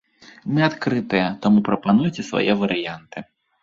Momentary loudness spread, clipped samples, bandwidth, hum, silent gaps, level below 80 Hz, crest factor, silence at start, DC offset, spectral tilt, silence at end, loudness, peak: 16 LU; under 0.1%; 7.4 kHz; none; none; -56 dBFS; 18 dB; 0.45 s; under 0.1%; -6.5 dB/octave; 0.4 s; -20 LUFS; -4 dBFS